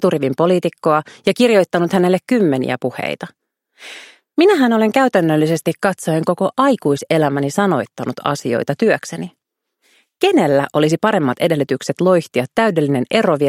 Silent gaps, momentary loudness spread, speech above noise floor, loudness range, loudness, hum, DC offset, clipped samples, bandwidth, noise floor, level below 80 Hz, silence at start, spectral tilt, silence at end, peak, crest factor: none; 10 LU; 50 dB; 3 LU; -16 LUFS; none; under 0.1%; under 0.1%; 16.5 kHz; -65 dBFS; -62 dBFS; 0 s; -6 dB/octave; 0 s; 0 dBFS; 16 dB